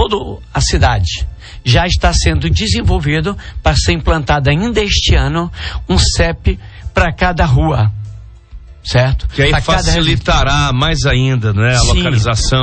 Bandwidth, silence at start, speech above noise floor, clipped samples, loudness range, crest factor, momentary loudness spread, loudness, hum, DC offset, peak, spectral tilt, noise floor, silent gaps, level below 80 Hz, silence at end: 8.8 kHz; 0 s; 21 dB; under 0.1%; 3 LU; 12 dB; 8 LU; -13 LUFS; none; under 0.1%; 0 dBFS; -4.5 dB/octave; -34 dBFS; none; -18 dBFS; 0 s